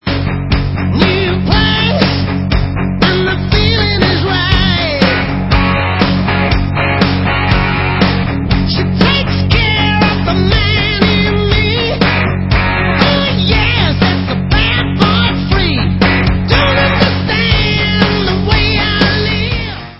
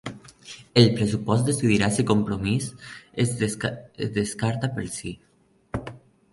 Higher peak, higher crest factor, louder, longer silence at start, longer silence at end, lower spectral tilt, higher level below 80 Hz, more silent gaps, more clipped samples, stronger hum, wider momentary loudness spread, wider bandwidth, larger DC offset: about the same, 0 dBFS vs -2 dBFS; second, 12 dB vs 22 dB; first, -12 LUFS vs -24 LUFS; about the same, 0.05 s vs 0.05 s; second, 0 s vs 0.35 s; first, -8 dB/octave vs -5.5 dB/octave; first, -20 dBFS vs -50 dBFS; neither; first, 0.1% vs under 0.1%; neither; second, 4 LU vs 21 LU; second, 6 kHz vs 11.5 kHz; neither